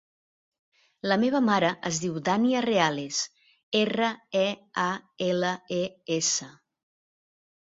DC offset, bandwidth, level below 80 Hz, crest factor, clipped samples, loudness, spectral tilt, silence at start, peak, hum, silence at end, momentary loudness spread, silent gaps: under 0.1%; 7.8 kHz; -70 dBFS; 22 dB; under 0.1%; -27 LUFS; -3.5 dB/octave; 1.05 s; -6 dBFS; none; 1.2 s; 7 LU; 3.63-3.72 s